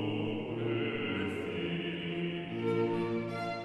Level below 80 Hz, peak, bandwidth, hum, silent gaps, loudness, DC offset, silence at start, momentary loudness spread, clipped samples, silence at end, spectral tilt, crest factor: -64 dBFS; -20 dBFS; 11 kHz; none; none; -35 LUFS; under 0.1%; 0 s; 4 LU; under 0.1%; 0 s; -7.5 dB/octave; 14 dB